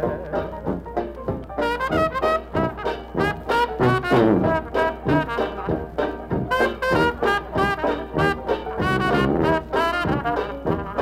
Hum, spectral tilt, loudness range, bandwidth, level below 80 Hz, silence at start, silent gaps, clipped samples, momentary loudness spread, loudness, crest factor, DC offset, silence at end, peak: none; -7 dB/octave; 3 LU; 16 kHz; -38 dBFS; 0 s; none; under 0.1%; 8 LU; -22 LUFS; 16 dB; under 0.1%; 0 s; -6 dBFS